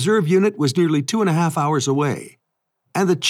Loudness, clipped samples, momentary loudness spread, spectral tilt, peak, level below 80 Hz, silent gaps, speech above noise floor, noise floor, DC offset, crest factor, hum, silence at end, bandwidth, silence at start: -19 LUFS; under 0.1%; 6 LU; -5.5 dB/octave; -6 dBFS; -78 dBFS; none; 56 dB; -74 dBFS; under 0.1%; 12 dB; none; 0 s; 15 kHz; 0 s